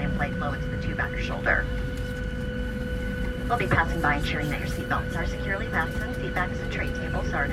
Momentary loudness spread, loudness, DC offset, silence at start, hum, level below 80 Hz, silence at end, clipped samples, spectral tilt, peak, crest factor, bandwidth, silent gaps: 7 LU; -28 LUFS; under 0.1%; 0 s; none; -34 dBFS; 0 s; under 0.1%; -6 dB/octave; -10 dBFS; 18 dB; 15 kHz; none